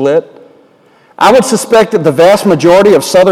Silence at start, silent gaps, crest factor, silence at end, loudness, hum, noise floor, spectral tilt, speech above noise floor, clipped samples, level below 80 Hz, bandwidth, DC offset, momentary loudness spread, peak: 0 s; none; 8 dB; 0 s; -7 LUFS; none; -45 dBFS; -4.5 dB/octave; 38 dB; 0.8%; -44 dBFS; 16.5 kHz; under 0.1%; 4 LU; 0 dBFS